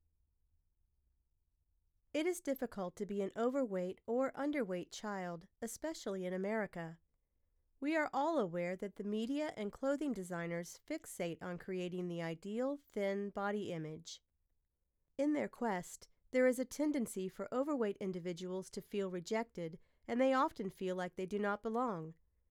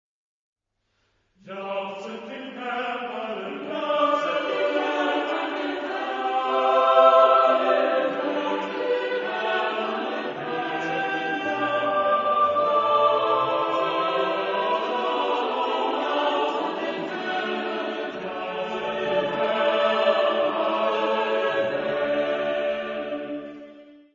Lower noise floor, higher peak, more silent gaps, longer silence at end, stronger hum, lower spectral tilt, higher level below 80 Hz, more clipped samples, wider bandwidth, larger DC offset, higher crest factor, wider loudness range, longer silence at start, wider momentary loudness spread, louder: first, -84 dBFS vs -73 dBFS; second, -20 dBFS vs -4 dBFS; neither; first, 0.35 s vs 0.2 s; neither; about the same, -5.5 dB/octave vs -4.5 dB/octave; about the same, -74 dBFS vs -70 dBFS; neither; first, 17.5 kHz vs 7.6 kHz; neither; about the same, 20 dB vs 20 dB; second, 4 LU vs 7 LU; first, 2.15 s vs 1.45 s; about the same, 10 LU vs 11 LU; second, -39 LUFS vs -24 LUFS